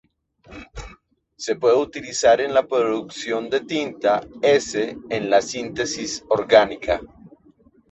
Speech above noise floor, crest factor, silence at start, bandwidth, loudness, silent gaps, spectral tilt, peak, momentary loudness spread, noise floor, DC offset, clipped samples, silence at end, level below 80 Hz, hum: 35 dB; 20 dB; 0.5 s; 8.2 kHz; -21 LUFS; none; -3.5 dB/octave; -2 dBFS; 12 LU; -55 dBFS; under 0.1%; under 0.1%; 0.65 s; -50 dBFS; none